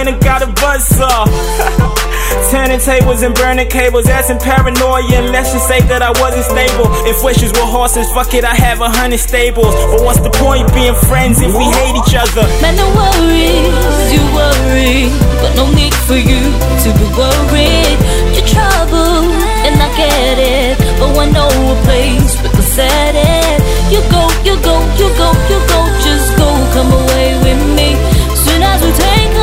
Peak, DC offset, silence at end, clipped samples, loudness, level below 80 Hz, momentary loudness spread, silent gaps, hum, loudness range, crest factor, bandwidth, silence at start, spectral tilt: 0 dBFS; under 0.1%; 0 s; 0.3%; -10 LUFS; -12 dBFS; 2 LU; none; none; 1 LU; 8 dB; 16.5 kHz; 0 s; -4.5 dB/octave